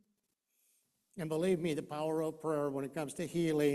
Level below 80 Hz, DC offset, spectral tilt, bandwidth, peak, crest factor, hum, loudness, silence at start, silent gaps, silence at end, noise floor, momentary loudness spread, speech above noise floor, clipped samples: -72 dBFS; under 0.1%; -6 dB/octave; 14 kHz; -20 dBFS; 16 dB; none; -36 LUFS; 1.15 s; none; 0 s; -82 dBFS; 7 LU; 48 dB; under 0.1%